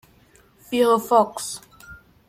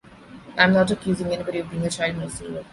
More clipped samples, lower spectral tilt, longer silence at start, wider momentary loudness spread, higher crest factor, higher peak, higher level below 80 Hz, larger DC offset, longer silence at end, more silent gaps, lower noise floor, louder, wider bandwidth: neither; second, -3.5 dB/octave vs -5 dB/octave; first, 0.7 s vs 0.05 s; about the same, 14 LU vs 14 LU; about the same, 20 dB vs 20 dB; about the same, -4 dBFS vs -2 dBFS; second, -60 dBFS vs -50 dBFS; neither; first, 0.35 s vs 0.05 s; neither; first, -55 dBFS vs -44 dBFS; about the same, -21 LUFS vs -23 LUFS; first, 16 kHz vs 11.5 kHz